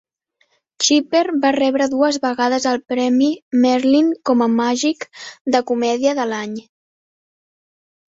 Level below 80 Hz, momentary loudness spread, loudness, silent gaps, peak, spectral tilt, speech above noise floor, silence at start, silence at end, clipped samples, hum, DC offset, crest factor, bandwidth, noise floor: -64 dBFS; 8 LU; -17 LUFS; 3.42-3.51 s, 5.41-5.45 s; -2 dBFS; -3 dB/octave; 47 dB; 0.8 s; 1.45 s; under 0.1%; none; under 0.1%; 16 dB; 8 kHz; -64 dBFS